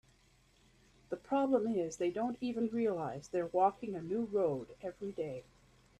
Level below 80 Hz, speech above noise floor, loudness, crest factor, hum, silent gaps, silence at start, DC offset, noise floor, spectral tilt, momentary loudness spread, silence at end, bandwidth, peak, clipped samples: -70 dBFS; 33 dB; -36 LUFS; 20 dB; none; none; 1.1 s; under 0.1%; -68 dBFS; -6.5 dB/octave; 11 LU; 0.55 s; 11 kHz; -18 dBFS; under 0.1%